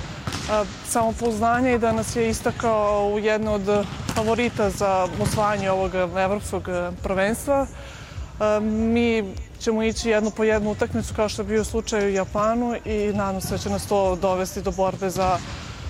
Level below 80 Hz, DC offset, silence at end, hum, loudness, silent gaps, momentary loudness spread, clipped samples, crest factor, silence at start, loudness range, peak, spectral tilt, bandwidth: -40 dBFS; under 0.1%; 0 s; none; -23 LUFS; none; 6 LU; under 0.1%; 16 dB; 0 s; 2 LU; -6 dBFS; -5 dB/octave; 16 kHz